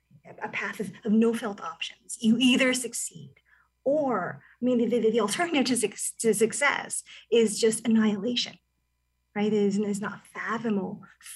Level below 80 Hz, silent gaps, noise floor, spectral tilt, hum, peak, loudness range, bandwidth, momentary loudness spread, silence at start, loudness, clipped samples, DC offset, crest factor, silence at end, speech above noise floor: -74 dBFS; none; -75 dBFS; -3.5 dB/octave; none; -10 dBFS; 3 LU; 13 kHz; 12 LU; 0.25 s; -26 LUFS; under 0.1%; under 0.1%; 16 dB; 0 s; 49 dB